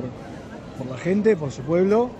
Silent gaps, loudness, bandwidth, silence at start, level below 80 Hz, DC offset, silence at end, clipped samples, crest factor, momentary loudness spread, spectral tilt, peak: none; -22 LUFS; 8.4 kHz; 0 s; -52 dBFS; under 0.1%; 0 s; under 0.1%; 14 dB; 18 LU; -7.5 dB/octave; -8 dBFS